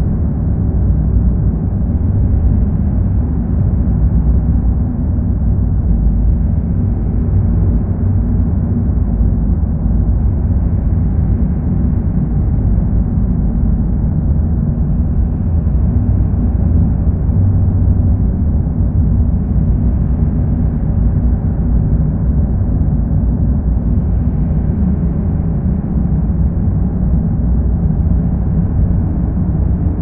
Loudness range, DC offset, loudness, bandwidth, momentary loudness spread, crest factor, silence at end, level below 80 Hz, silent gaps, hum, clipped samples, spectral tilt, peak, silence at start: 1 LU; under 0.1%; -15 LUFS; 2.1 kHz; 2 LU; 12 dB; 0 s; -16 dBFS; none; none; under 0.1%; -14.5 dB/octave; -2 dBFS; 0 s